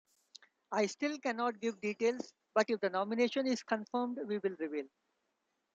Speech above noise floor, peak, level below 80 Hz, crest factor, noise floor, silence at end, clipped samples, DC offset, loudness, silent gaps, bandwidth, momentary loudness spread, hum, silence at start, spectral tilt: 48 dB; -16 dBFS; -86 dBFS; 20 dB; -83 dBFS; 0.85 s; under 0.1%; under 0.1%; -36 LUFS; none; 8.8 kHz; 7 LU; none; 0.7 s; -4.5 dB/octave